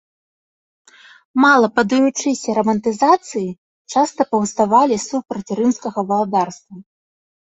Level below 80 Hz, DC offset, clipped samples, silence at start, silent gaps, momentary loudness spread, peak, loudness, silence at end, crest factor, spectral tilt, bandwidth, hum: -62 dBFS; under 0.1%; under 0.1%; 1.35 s; 3.58-3.85 s; 11 LU; -2 dBFS; -17 LUFS; 0.75 s; 16 dB; -4.5 dB/octave; 8.2 kHz; none